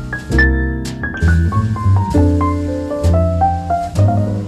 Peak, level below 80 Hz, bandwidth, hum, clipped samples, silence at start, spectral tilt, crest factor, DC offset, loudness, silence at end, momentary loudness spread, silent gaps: -2 dBFS; -22 dBFS; 11 kHz; none; under 0.1%; 0 s; -7.5 dB/octave; 12 dB; under 0.1%; -15 LUFS; 0 s; 6 LU; none